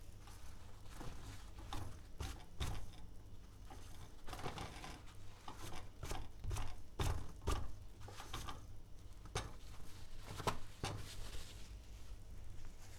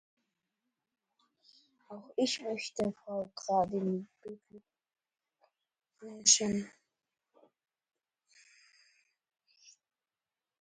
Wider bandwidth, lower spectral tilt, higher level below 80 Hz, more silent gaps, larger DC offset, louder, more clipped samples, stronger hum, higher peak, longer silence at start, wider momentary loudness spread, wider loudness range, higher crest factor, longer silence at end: first, 16.5 kHz vs 9.4 kHz; first, -4.5 dB/octave vs -2.5 dB/octave; first, -50 dBFS vs -74 dBFS; neither; neither; second, -50 LUFS vs -32 LUFS; neither; neither; second, -24 dBFS vs -10 dBFS; second, 0 s vs 1.9 s; second, 14 LU vs 26 LU; about the same, 4 LU vs 6 LU; second, 22 dB vs 28 dB; second, 0 s vs 0.9 s